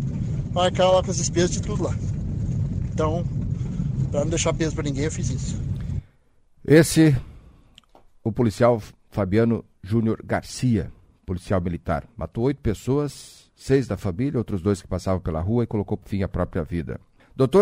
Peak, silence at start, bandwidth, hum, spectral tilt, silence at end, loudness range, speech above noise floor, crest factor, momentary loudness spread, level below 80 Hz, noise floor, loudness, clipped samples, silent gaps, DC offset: -2 dBFS; 0 s; 16 kHz; none; -6 dB/octave; 0 s; 4 LU; 35 dB; 22 dB; 12 LU; -38 dBFS; -58 dBFS; -24 LUFS; under 0.1%; none; under 0.1%